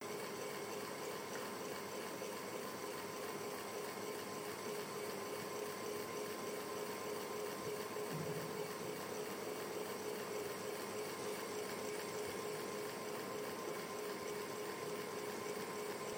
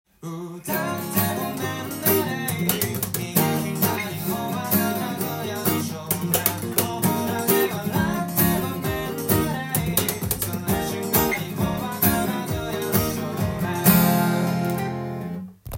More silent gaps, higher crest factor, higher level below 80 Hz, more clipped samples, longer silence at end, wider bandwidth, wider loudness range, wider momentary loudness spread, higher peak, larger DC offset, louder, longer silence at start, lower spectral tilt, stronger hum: neither; second, 14 dB vs 22 dB; second, -82 dBFS vs -46 dBFS; neither; about the same, 0 s vs 0 s; first, over 20 kHz vs 17 kHz; about the same, 1 LU vs 2 LU; second, 2 LU vs 7 LU; second, -30 dBFS vs -2 dBFS; neither; second, -44 LUFS vs -23 LUFS; second, 0 s vs 0.2 s; about the same, -3.5 dB/octave vs -4.5 dB/octave; neither